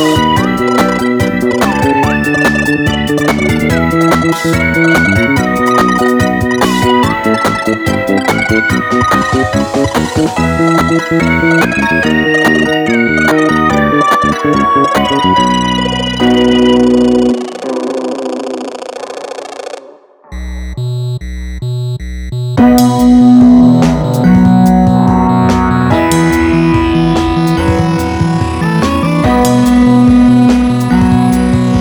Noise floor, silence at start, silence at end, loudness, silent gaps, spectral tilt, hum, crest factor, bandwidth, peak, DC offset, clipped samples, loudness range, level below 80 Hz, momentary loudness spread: -37 dBFS; 0 s; 0 s; -10 LUFS; none; -6 dB/octave; none; 10 dB; 19 kHz; 0 dBFS; under 0.1%; under 0.1%; 8 LU; -28 dBFS; 11 LU